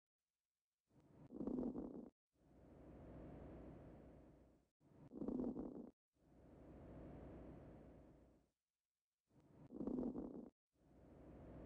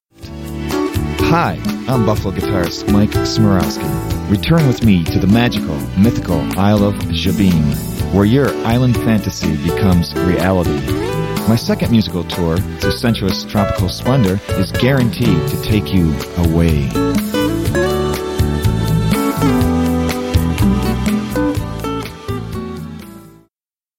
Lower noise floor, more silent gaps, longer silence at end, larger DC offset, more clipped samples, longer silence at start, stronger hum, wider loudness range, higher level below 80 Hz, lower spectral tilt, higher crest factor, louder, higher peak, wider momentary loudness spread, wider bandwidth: about the same, under -90 dBFS vs -88 dBFS; first, 2.12-2.30 s, 4.71-4.80 s, 5.93-6.12 s, 8.70-8.74 s, 8.80-8.95 s, 9.01-9.25 s, 10.52-10.70 s vs none; second, 0 s vs 0.7 s; neither; neither; first, 0.95 s vs 0.2 s; neither; first, 9 LU vs 2 LU; second, -70 dBFS vs -28 dBFS; first, -10 dB/octave vs -6.5 dB/octave; about the same, 18 dB vs 14 dB; second, -52 LUFS vs -15 LUFS; second, -36 dBFS vs 0 dBFS; first, 20 LU vs 7 LU; second, 4.9 kHz vs 17 kHz